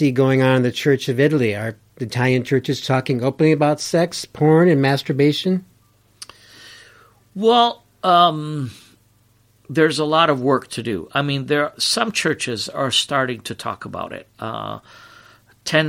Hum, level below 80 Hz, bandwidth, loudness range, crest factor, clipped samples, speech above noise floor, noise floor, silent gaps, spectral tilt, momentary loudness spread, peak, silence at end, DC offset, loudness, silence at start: 50 Hz at -45 dBFS; -60 dBFS; 16 kHz; 4 LU; 18 dB; under 0.1%; 39 dB; -57 dBFS; none; -5 dB/octave; 15 LU; -2 dBFS; 0 s; under 0.1%; -18 LUFS; 0 s